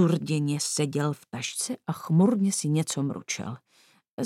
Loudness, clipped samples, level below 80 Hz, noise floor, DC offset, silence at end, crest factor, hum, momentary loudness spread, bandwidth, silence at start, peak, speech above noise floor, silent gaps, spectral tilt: -27 LUFS; under 0.1%; -76 dBFS; -62 dBFS; under 0.1%; 0 s; 16 dB; none; 11 LU; 15.5 kHz; 0 s; -12 dBFS; 36 dB; 4.11-4.18 s; -5 dB/octave